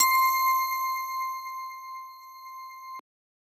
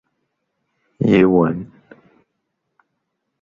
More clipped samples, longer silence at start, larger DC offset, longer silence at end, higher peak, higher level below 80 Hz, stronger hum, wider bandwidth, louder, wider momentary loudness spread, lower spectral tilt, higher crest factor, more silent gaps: neither; second, 0 s vs 1 s; neither; second, 0.4 s vs 1.75 s; second, -8 dBFS vs -2 dBFS; second, under -90 dBFS vs -52 dBFS; neither; first, over 20 kHz vs 7.2 kHz; second, -26 LUFS vs -16 LUFS; first, 21 LU vs 17 LU; second, 4.5 dB/octave vs -9 dB/octave; about the same, 20 dB vs 18 dB; neither